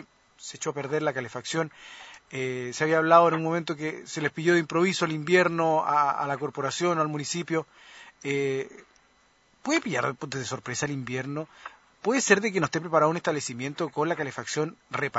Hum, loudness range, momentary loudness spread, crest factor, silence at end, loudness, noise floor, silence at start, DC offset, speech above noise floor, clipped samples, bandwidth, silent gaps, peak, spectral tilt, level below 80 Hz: none; 7 LU; 13 LU; 26 dB; 0 s; -26 LUFS; -63 dBFS; 0 s; under 0.1%; 36 dB; under 0.1%; 8 kHz; none; -2 dBFS; -4.5 dB/octave; -70 dBFS